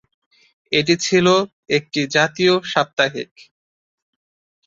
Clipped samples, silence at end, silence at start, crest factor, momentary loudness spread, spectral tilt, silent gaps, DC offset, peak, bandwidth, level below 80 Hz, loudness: under 0.1%; 1.4 s; 0.7 s; 18 dB; 6 LU; -4 dB/octave; 1.53-1.63 s, 2.93-2.97 s; under 0.1%; -2 dBFS; 7.8 kHz; -62 dBFS; -18 LUFS